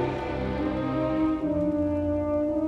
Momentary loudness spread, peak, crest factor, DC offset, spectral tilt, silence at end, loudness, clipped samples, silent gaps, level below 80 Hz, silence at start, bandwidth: 3 LU; -16 dBFS; 12 dB; under 0.1%; -9 dB/octave; 0 s; -27 LUFS; under 0.1%; none; -42 dBFS; 0 s; 6.2 kHz